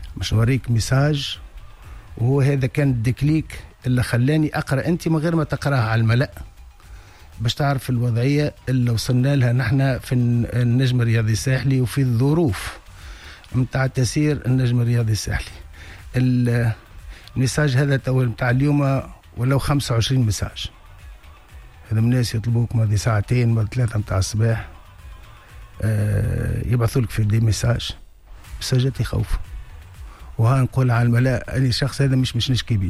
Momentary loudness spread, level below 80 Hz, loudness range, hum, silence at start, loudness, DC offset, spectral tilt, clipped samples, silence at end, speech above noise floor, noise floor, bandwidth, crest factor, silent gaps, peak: 13 LU; -36 dBFS; 3 LU; none; 0 s; -20 LUFS; under 0.1%; -6.5 dB/octave; under 0.1%; 0 s; 23 dB; -42 dBFS; 13.5 kHz; 12 dB; none; -8 dBFS